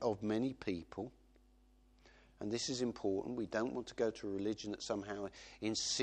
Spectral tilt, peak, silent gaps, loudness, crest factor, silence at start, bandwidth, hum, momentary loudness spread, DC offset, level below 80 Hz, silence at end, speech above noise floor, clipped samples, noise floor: -4 dB/octave; -22 dBFS; none; -40 LUFS; 18 dB; 0 s; 9.6 kHz; none; 9 LU; under 0.1%; -68 dBFS; 0 s; 28 dB; under 0.1%; -67 dBFS